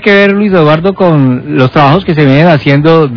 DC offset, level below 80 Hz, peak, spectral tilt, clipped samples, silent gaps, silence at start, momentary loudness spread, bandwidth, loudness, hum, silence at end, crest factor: 0.9%; -38 dBFS; 0 dBFS; -8.5 dB/octave; 9%; none; 0 s; 3 LU; 5.4 kHz; -7 LUFS; none; 0 s; 6 dB